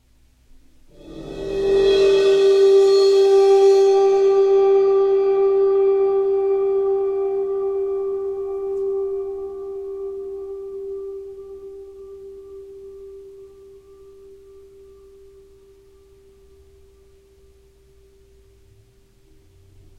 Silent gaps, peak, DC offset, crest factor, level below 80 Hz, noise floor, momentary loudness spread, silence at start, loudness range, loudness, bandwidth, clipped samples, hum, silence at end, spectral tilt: none; -6 dBFS; under 0.1%; 14 dB; -52 dBFS; -55 dBFS; 25 LU; 1.05 s; 21 LU; -17 LUFS; 8.2 kHz; under 0.1%; none; 6.5 s; -5 dB/octave